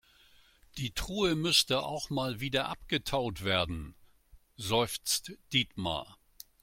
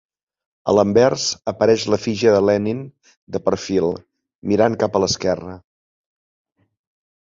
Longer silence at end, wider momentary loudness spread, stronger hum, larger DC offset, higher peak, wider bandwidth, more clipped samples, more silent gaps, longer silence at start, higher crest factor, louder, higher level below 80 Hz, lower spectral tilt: second, 0.5 s vs 1.7 s; about the same, 14 LU vs 14 LU; neither; neither; second, -12 dBFS vs -2 dBFS; first, 16.5 kHz vs 7.8 kHz; neither; second, none vs 3.17-3.27 s, 4.35-4.42 s; about the same, 0.75 s vs 0.65 s; about the same, 22 dB vs 18 dB; second, -31 LUFS vs -19 LUFS; about the same, -52 dBFS vs -50 dBFS; second, -3.5 dB/octave vs -5 dB/octave